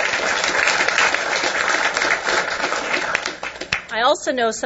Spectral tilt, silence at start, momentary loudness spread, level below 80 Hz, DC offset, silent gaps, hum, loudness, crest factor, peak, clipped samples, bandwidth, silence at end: -1 dB/octave; 0 s; 7 LU; -54 dBFS; under 0.1%; none; none; -19 LUFS; 20 dB; 0 dBFS; under 0.1%; 8.2 kHz; 0 s